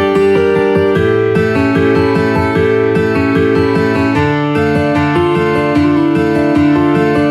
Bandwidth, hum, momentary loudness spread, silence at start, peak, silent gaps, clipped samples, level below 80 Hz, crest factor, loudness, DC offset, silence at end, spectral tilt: 12 kHz; none; 2 LU; 0 s; 0 dBFS; none; under 0.1%; -38 dBFS; 10 dB; -12 LUFS; under 0.1%; 0 s; -7.5 dB/octave